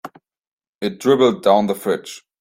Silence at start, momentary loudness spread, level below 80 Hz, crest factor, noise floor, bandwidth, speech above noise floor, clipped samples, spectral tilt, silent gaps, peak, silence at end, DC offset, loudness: 0.05 s; 12 LU; -62 dBFS; 18 dB; -40 dBFS; 16.5 kHz; 23 dB; under 0.1%; -5.5 dB/octave; 0.47-0.58 s, 0.68-0.79 s; -2 dBFS; 0.2 s; under 0.1%; -18 LUFS